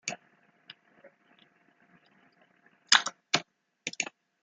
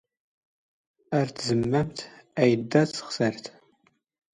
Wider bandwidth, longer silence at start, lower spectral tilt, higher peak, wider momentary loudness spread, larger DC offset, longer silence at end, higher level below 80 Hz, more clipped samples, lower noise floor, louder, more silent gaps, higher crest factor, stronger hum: about the same, 11.5 kHz vs 11 kHz; second, 0.05 s vs 1.1 s; second, 0 dB/octave vs -6 dB/octave; first, -2 dBFS vs -6 dBFS; first, 20 LU vs 14 LU; neither; second, 0.4 s vs 0.85 s; second, -86 dBFS vs -60 dBFS; neither; about the same, -66 dBFS vs -67 dBFS; about the same, -28 LUFS vs -26 LUFS; neither; first, 34 dB vs 22 dB; neither